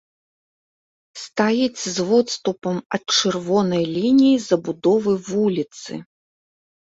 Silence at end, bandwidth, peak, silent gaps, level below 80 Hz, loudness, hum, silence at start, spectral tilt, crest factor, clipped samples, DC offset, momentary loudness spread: 0.8 s; 8 kHz; -2 dBFS; 2.86-2.90 s; -62 dBFS; -20 LUFS; none; 1.15 s; -4.5 dB/octave; 18 dB; under 0.1%; under 0.1%; 13 LU